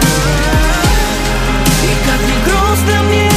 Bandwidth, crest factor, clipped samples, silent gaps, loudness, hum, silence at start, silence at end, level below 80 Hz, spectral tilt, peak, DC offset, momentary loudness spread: 15.5 kHz; 10 dB; under 0.1%; none; -12 LUFS; none; 0 s; 0 s; -16 dBFS; -4 dB/octave; 0 dBFS; under 0.1%; 2 LU